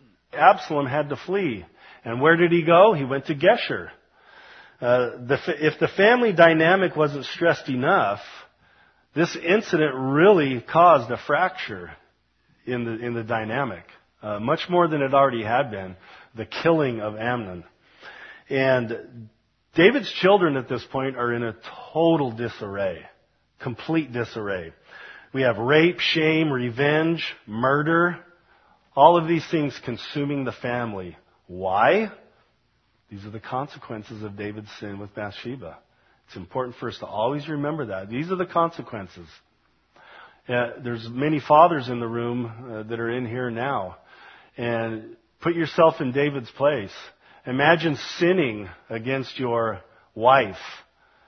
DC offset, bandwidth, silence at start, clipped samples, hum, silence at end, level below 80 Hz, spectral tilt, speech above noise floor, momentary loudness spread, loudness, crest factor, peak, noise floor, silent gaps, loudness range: under 0.1%; 6.4 kHz; 0.35 s; under 0.1%; none; 0.45 s; -62 dBFS; -6.5 dB/octave; 45 dB; 19 LU; -22 LUFS; 24 dB; 0 dBFS; -67 dBFS; none; 9 LU